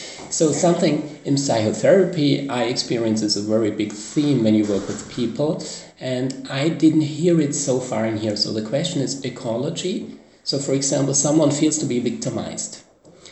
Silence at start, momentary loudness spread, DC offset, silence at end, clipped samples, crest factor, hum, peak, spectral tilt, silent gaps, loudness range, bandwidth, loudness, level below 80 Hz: 0 s; 10 LU; under 0.1%; 0 s; under 0.1%; 18 dB; none; -2 dBFS; -4.5 dB/octave; none; 3 LU; 8.6 kHz; -21 LUFS; -60 dBFS